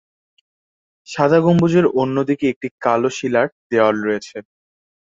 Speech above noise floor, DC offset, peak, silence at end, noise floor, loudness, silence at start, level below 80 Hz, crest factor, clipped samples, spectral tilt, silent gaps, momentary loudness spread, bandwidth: over 73 dB; under 0.1%; -2 dBFS; 0.7 s; under -90 dBFS; -17 LUFS; 1.1 s; -56 dBFS; 16 dB; under 0.1%; -7 dB/octave; 2.56-2.61 s, 2.71-2.78 s, 3.52-3.70 s; 10 LU; 7.8 kHz